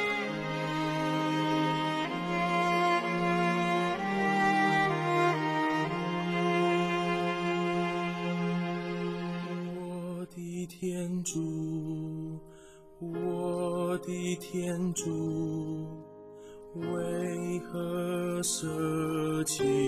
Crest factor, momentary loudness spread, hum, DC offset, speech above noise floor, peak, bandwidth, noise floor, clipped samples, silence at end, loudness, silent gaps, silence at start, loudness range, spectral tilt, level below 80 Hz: 16 dB; 11 LU; none; under 0.1%; 21 dB; -16 dBFS; 15.5 kHz; -53 dBFS; under 0.1%; 0 s; -31 LUFS; none; 0 s; 8 LU; -5 dB/octave; -64 dBFS